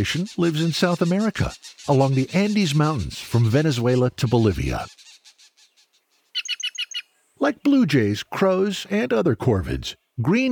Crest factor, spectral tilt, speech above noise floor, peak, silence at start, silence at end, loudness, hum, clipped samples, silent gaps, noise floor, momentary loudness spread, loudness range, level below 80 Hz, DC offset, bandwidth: 16 dB; -6 dB/octave; 45 dB; -4 dBFS; 0 s; 0 s; -22 LUFS; none; under 0.1%; none; -65 dBFS; 10 LU; 5 LU; -42 dBFS; under 0.1%; 18.5 kHz